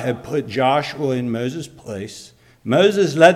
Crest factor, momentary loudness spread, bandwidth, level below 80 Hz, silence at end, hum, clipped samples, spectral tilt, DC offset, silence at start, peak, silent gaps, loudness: 18 dB; 17 LU; 14.5 kHz; -58 dBFS; 0 s; none; under 0.1%; -5.5 dB/octave; under 0.1%; 0 s; 0 dBFS; none; -19 LUFS